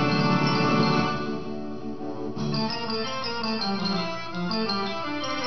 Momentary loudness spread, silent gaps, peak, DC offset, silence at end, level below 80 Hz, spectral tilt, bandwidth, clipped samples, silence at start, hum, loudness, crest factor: 12 LU; none; -8 dBFS; 1%; 0 s; -54 dBFS; -6 dB/octave; 6.4 kHz; under 0.1%; 0 s; none; -26 LUFS; 18 dB